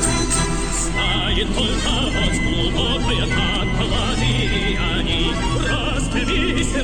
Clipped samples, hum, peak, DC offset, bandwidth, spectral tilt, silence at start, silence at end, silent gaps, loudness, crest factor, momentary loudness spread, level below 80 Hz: under 0.1%; none; -2 dBFS; under 0.1%; 12.5 kHz; -3.5 dB/octave; 0 s; 0 s; none; -19 LUFS; 16 dB; 2 LU; -24 dBFS